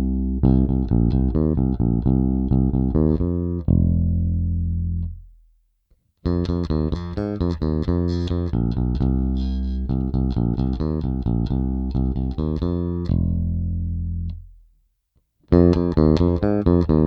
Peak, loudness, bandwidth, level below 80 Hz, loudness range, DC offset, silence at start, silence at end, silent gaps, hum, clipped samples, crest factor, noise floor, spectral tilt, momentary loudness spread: 0 dBFS; -22 LUFS; 6.2 kHz; -26 dBFS; 5 LU; under 0.1%; 0 s; 0 s; none; none; under 0.1%; 20 dB; -67 dBFS; -10.5 dB/octave; 8 LU